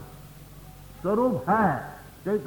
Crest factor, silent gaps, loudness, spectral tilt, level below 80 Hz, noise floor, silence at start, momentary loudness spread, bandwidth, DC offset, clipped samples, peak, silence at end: 18 dB; none; -26 LUFS; -8 dB/octave; -52 dBFS; -46 dBFS; 0 s; 23 LU; 19.5 kHz; under 0.1%; under 0.1%; -10 dBFS; 0 s